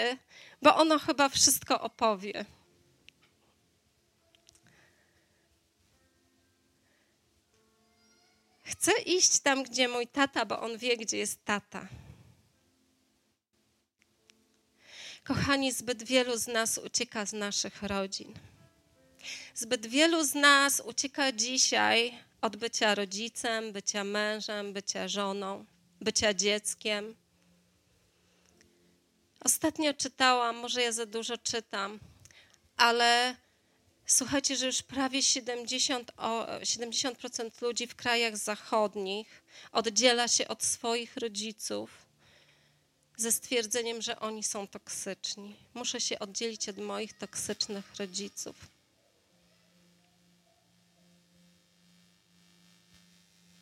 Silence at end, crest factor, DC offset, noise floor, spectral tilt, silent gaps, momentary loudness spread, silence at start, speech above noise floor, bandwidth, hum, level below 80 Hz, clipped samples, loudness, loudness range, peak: 4.95 s; 26 dB; under 0.1%; -75 dBFS; -1.5 dB/octave; none; 15 LU; 0 s; 44 dB; 16 kHz; none; -68 dBFS; under 0.1%; -29 LUFS; 9 LU; -6 dBFS